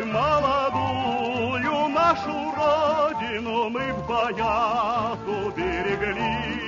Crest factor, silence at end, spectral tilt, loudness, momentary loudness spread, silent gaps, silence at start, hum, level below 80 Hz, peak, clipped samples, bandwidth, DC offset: 16 dB; 0 s; -5.5 dB/octave; -24 LUFS; 6 LU; none; 0 s; none; -46 dBFS; -8 dBFS; under 0.1%; 7.4 kHz; under 0.1%